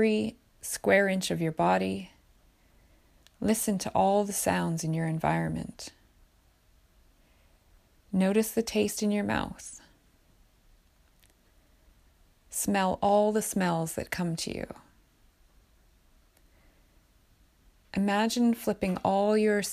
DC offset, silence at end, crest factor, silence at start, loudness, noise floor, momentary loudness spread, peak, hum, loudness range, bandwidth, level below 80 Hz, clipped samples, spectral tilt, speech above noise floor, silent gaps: under 0.1%; 0 s; 20 dB; 0 s; -28 LUFS; -64 dBFS; 14 LU; -10 dBFS; none; 9 LU; 15.5 kHz; -58 dBFS; under 0.1%; -5 dB/octave; 36 dB; none